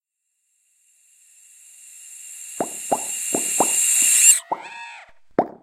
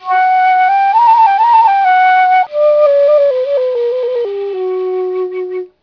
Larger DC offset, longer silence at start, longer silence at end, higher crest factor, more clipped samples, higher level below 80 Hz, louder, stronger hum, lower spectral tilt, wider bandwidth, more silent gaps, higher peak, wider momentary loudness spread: neither; first, 1.9 s vs 0 s; about the same, 0.1 s vs 0.15 s; first, 24 dB vs 10 dB; neither; about the same, -68 dBFS vs -66 dBFS; second, -17 LUFS vs -11 LUFS; neither; second, 0 dB/octave vs -4 dB/octave; first, 16 kHz vs 5.4 kHz; neither; about the same, 0 dBFS vs 0 dBFS; first, 25 LU vs 10 LU